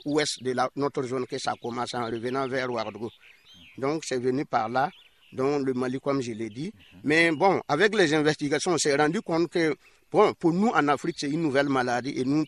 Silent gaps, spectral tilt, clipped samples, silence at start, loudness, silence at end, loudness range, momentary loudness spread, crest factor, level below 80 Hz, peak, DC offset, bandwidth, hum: none; -4.5 dB/octave; under 0.1%; 0.05 s; -26 LUFS; 0 s; 7 LU; 10 LU; 20 dB; -66 dBFS; -6 dBFS; under 0.1%; 12 kHz; none